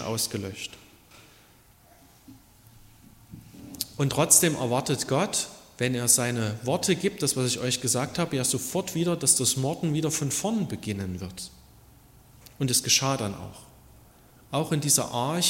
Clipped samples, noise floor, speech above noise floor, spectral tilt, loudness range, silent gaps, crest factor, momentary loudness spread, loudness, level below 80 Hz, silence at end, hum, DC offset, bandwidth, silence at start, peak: under 0.1%; -57 dBFS; 30 dB; -3.5 dB/octave; 7 LU; none; 26 dB; 15 LU; -25 LUFS; -60 dBFS; 0 s; none; under 0.1%; 16.5 kHz; 0 s; -2 dBFS